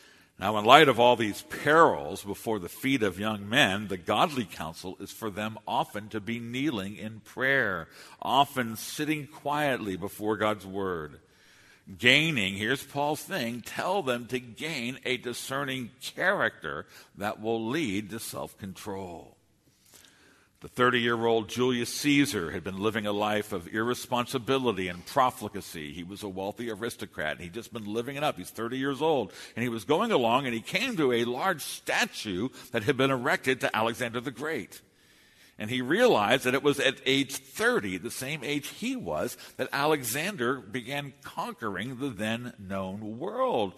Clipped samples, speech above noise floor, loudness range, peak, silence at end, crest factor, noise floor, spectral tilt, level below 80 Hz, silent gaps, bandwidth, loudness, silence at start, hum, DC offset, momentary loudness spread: under 0.1%; 37 dB; 6 LU; 0 dBFS; 0.05 s; 28 dB; -65 dBFS; -4 dB/octave; -64 dBFS; none; 13.5 kHz; -28 LUFS; 0.4 s; none; under 0.1%; 13 LU